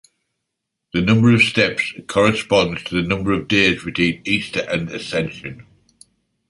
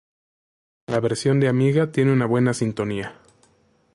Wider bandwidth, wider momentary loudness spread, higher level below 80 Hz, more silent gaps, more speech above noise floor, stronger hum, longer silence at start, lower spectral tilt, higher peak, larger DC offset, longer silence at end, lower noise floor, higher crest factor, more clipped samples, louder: about the same, 11.5 kHz vs 11.5 kHz; about the same, 10 LU vs 8 LU; first, -46 dBFS vs -58 dBFS; neither; first, 61 dB vs 41 dB; neither; about the same, 0.95 s vs 0.9 s; second, -5.5 dB/octave vs -7 dB/octave; first, -2 dBFS vs -8 dBFS; neither; about the same, 0.85 s vs 0.8 s; first, -79 dBFS vs -61 dBFS; about the same, 18 dB vs 14 dB; neither; first, -18 LUFS vs -21 LUFS